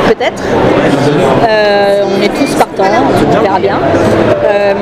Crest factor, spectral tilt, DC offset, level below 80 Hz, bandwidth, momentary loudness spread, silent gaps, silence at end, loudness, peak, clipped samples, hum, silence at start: 8 dB; -6 dB/octave; under 0.1%; -32 dBFS; 16 kHz; 3 LU; none; 0 s; -9 LUFS; 0 dBFS; 0.5%; none; 0 s